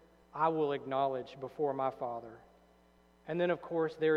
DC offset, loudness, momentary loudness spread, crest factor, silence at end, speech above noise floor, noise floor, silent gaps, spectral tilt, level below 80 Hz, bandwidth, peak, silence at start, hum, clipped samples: under 0.1%; -35 LUFS; 13 LU; 18 dB; 0 s; 32 dB; -65 dBFS; none; -8 dB/octave; -72 dBFS; 6.8 kHz; -16 dBFS; 0.35 s; none; under 0.1%